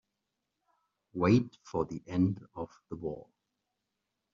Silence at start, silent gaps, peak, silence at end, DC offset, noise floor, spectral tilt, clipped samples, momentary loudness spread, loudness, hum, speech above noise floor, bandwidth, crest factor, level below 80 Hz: 1.15 s; none; -14 dBFS; 1.1 s; under 0.1%; -85 dBFS; -8 dB/octave; under 0.1%; 17 LU; -32 LUFS; none; 53 dB; 7.4 kHz; 20 dB; -64 dBFS